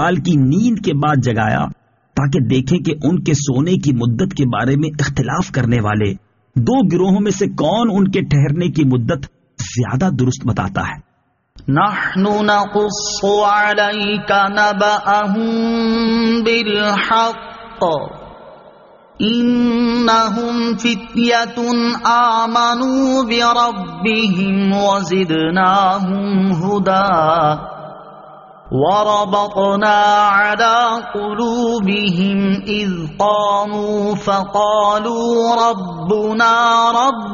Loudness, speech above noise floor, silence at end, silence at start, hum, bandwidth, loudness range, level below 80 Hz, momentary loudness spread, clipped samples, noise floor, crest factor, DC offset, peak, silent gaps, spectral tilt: -15 LUFS; 47 dB; 0 s; 0 s; none; 7.4 kHz; 3 LU; -44 dBFS; 7 LU; under 0.1%; -62 dBFS; 14 dB; under 0.1%; -2 dBFS; none; -4.5 dB/octave